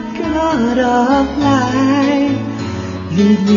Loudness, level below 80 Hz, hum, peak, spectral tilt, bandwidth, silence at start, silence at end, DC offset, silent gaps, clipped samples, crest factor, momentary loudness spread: -14 LUFS; -38 dBFS; none; 0 dBFS; -6.5 dB/octave; 7.4 kHz; 0 s; 0 s; under 0.1%; none; under 0.1%; 12 dB; 9 LU